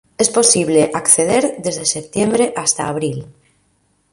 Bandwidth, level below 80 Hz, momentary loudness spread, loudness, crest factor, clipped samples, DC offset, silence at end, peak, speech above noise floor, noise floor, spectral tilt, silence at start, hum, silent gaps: 12.5 kHz; -54 dBFS; 9 LU; -15 LUFS; 16 dB; under 0.1%; under 0.1%; 0.8 s; 0 dBFS; 45 dB; -61 dBFS; -3 dB/octave; 0.2 s; none; none